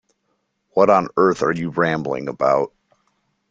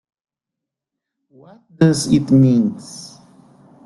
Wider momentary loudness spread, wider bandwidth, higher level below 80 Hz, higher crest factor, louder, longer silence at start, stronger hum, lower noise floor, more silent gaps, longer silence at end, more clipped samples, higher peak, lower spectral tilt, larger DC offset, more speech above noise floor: second, 9 LU vs 21 LU; second, 7.8 kHz vs 12 kHz; second, -58 dBFS vs -52 dBFS; about the same, 18 dB vs 18 dB; second, -19 LUFS vs -15 LUFS; second, 0.75 s vs 1.8 s; neither; second, -70 dBFS vs -84 dBFS; neither; about the same, 0.85 s vs 0.8 s; neither; about the same, -2 dBFS vs -2 dBFS; about the same, -6.5 dB/octave vs -6.5 dB/octave; neither; second, 53 dB vs 68 dB